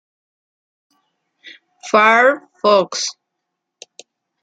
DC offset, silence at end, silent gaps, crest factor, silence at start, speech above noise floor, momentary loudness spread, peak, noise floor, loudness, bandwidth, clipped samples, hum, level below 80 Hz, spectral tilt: under 0.1%; 1.3 s; none; 18 dB; 1.45 s; 63 dB; 13 LU; -2 dBFS; -78 dBFS; -15 LUFS; 9.2 kHz; under 0.1%; none; -70 dBFS; -2.5 dB/octave